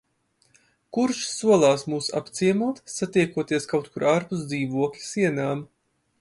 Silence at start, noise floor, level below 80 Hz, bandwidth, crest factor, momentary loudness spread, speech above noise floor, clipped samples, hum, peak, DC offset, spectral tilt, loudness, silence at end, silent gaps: 0.95 s; -67 dBFS; -66 dBFS; 11.5 kHz; 20 dB; 9 LU; 44 dB; under 0.1%; none; -6 dBFS; under 0.1%; -5 dB/octave; -24 LUFS; 0.55 s; none